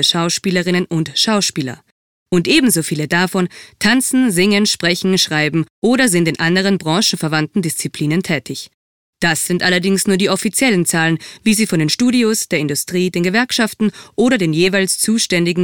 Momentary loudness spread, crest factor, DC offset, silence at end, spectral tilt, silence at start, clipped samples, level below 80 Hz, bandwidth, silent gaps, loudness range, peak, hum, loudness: 6 LU; 14 dB; 0.3%; 0 s; -4 dB/octave; 0 s; under 0.1%; -54 dBFS; 18 kHz; 1.91-2.26 s, 5.70-5.82 s, 8.74-9.13 s; 3 LU; -2 dBFS; none; -15 LUFS